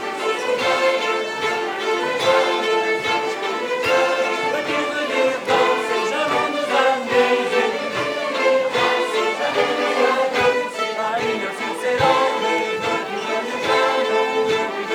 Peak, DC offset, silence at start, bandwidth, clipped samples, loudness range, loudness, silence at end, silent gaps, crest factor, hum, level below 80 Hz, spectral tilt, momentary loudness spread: -4 dBFS; under 0.1%; 0 s; 17.5 kHz; under 0.1%; 1 LU; -19 LUFS; 0 s; none; 16 dB; none; -62 dBFS; -3 dB/octave; 5 LU